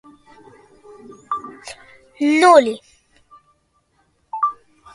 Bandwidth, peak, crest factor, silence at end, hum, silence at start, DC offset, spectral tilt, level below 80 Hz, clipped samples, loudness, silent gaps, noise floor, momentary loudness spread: 11.5 kHz; 0 dBFS; 22 dB; 0.45 s; none; 1.3 s; under 0.1%; -3 dB/octave; -64 dBFS; under 0.1%; -17 LUFS; none; -63 dBFS; 26 LU